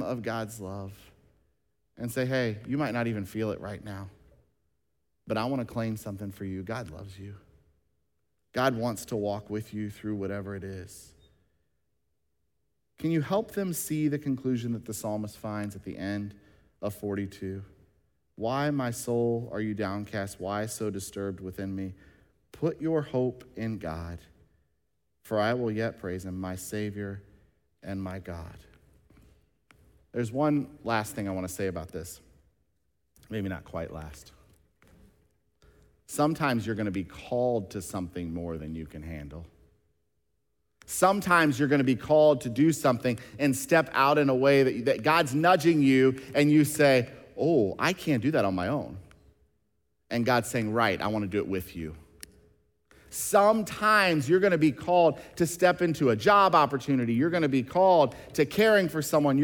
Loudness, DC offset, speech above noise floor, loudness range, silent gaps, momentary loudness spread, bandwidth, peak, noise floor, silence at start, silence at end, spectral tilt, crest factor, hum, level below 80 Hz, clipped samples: -27 LUFS; under 0.1%; 53 dB; 14 LU; none; 17 LU; 18 kHz; -8 dBFS; -80 dBFS; 0 s; 0 s; -5.5 dB/octave; 22 dB; none; -58 dBFS; under 0.1%